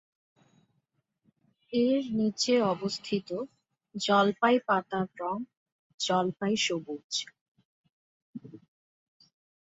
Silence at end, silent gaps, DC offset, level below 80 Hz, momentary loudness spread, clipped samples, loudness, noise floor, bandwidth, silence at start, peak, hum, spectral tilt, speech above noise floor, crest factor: 1.05 s; 5.57-5.66 s, 5.72-5.98 s, 7.04-7.10 s, 7.41-7.55 s, 7.65-7.84 s, 7.92-8.33 s; under 0.1%; -74 dBFS; 20 LU; under 0.1%; -29 LUFS; -78 dBFS; 8 kHz; 1.7 s; -10 dBFS; none; -4 dB/octave; 49 dB; 22 dB